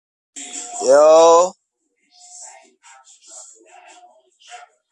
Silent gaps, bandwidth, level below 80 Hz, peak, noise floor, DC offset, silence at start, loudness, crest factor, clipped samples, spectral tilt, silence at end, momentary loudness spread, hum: none; 11 kHz; -76 dBFS; -2 dBFS; -69 dBFS; under 0.1%; 0.35 s; -13 LUFS; 16 dB; under 0.1%; -2 dB/octave; 3.4 s; 29 LU; none